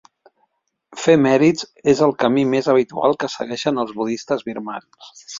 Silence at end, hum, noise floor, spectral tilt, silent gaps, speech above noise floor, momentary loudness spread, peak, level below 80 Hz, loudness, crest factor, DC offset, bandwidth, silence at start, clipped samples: 0 s; none; -68 dBFS; -5.5 dB/octave; none; 50 dB; 13 LU; -2 dBFS; -60 dBFS; -18 LUFS; 18 dB; under 0.1%; 7.8 kHz; 0.9 s; under 0.1%